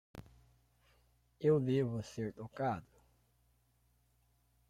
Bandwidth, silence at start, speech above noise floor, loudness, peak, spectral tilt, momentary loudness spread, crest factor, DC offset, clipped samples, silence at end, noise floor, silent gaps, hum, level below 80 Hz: 13.5 kHz; 0.15 s; 39 dB; -36 LUFS; -20 dBFS; -8 dB/octave; 15 LU; 20 dB; under 0.1%; under 0.1%; 1.9 s; -74 dBFS; none; none; -70 dBFS